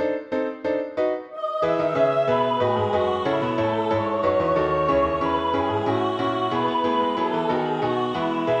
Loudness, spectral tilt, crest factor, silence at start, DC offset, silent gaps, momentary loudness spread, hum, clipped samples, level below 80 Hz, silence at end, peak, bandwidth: -23 LUFS; -7 dB/octave; 14 dB; 0 s; under 0.1%; none; 5 LU; none; under 0.1%; -50 dBFS; 0 s; -10 dBFS; 9 kHz